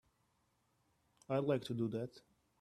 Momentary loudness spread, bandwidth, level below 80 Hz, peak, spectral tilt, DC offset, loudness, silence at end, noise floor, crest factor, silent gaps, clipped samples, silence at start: 8 LU; 13.5 kHz; -78 dBFS; -22 dBFS; -7.5 dB/octave; under 0.1%; -39 LUFS; 0.4 s; -79 dBFS; 20 dB; none; under 0.1%; 1.3 s